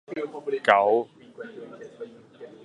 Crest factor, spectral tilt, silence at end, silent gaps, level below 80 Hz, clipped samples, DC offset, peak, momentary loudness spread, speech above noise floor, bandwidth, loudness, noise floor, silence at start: 26 dB; -5 dB/octave; 0.15 s; none; -76 dBFS; under 0.1%; under 0.1%; -2 dBFS; 23 LU; 23 dB; 11.5 kHz; -23 LUFS; -46 dBFS; 0.1 s